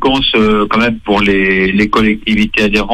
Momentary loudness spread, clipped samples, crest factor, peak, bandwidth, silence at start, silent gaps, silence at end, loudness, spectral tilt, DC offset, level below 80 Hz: 2 LU; under 0.1%; 10 dB; 0 dBFS; 11.5 kHz; 0 s; none; 0 s; -11 LUFS; -5.5 dB/octave; under 0.1%; -28 dBFS